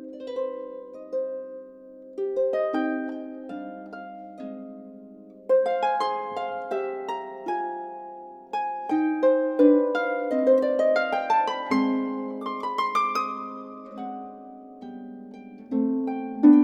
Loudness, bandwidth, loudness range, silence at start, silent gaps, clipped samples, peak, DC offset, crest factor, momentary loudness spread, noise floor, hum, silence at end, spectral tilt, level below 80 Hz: -25 LUFS; 8 kHz; 8 LU; 0 s; none; under 0.1%; -4 dBFS; under 0.1%; 20 dB; 20 LU; -46 dBFS; none; 0 s; -6 dB/octave; -76 dBFS